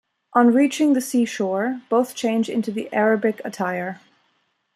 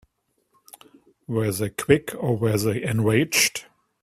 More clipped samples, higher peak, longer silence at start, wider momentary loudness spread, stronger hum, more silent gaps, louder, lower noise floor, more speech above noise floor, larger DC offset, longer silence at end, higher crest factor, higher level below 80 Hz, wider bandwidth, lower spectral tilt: neither; about the same, -4 dBFS vs -2 dBFS; second, 0.35 s vs 1.3 s; about the same, 9 LU vs 7 LU; neither; neither; about the same, -21 LUFS vs -22 LUFS; about the same, -68 dBFS vs -71 dBFS; about the same, 48 dB vs 49 dB; neither; first, 0.8 s vs 0.4 s; about the same, 18 dB vs 22 dB; second, -74 dBFS vs -54 dBFS; second, 14.5 kHz vs 16 kHz; about the same, -5 dB/octave vs -4.5 dB/octave